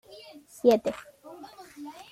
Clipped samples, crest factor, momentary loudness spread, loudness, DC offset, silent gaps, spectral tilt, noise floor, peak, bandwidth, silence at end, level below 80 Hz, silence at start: under 0.1%; 22 dB; 24 LU; -25 LUFS; under 0.1%; none; -5 dB/octave; -49 dBFS; -8 dBFS; 15.5 kHz; 0.2 s; -68 dBFS; 0.65 s